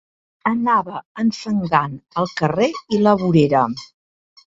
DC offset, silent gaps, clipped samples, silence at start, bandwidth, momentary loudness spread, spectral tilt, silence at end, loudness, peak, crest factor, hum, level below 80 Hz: under 0.1%; 1.05-1.15 s; under 0.1%; 0.45 s; 7.8 kHz; 9 LU; -7 dB/octave; 0.75 s; -19 LUFS; -2 dBFS; 18 dB; none; -54 dBFS